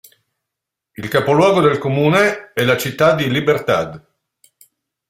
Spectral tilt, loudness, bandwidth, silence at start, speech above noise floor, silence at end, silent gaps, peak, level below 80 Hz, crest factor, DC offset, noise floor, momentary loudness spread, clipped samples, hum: -5.5 dB/octave; -15 LUFS; 16 kHz; 1 s; 67 dB; 1.1 s; none; -2 dBFS; -54 dBFS; 16 dB; under 0.1%; -82 dBFS; 7 LU; under 0.1%; none